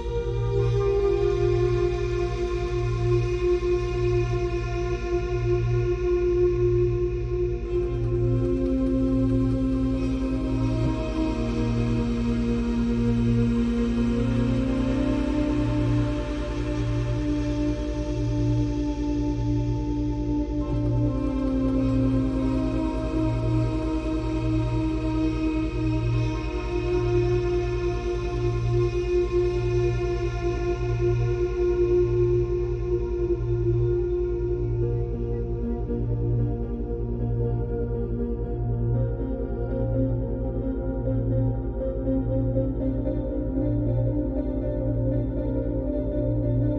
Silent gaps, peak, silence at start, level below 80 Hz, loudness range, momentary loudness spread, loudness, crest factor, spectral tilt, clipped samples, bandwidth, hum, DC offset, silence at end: none; -12 dBFS; 0 s; -30 dBFS; 3 LU; 5 LU; -26 LUFS; 12 dB; -8.5 dB/octave; under 0.1%; 8.2 kHz; none; under 0.1%; 0 s